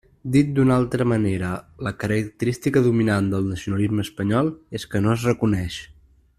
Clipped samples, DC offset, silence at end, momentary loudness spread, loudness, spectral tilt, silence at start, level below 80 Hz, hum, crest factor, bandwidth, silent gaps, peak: under 0.1%; under 0.1%; 0.45 s; 10 LU; -22 LUFS; -7 dB/octave; 0.25 s; -48 dBFS; none; 16 dB; 14.5 kHz; none; -6 dBFS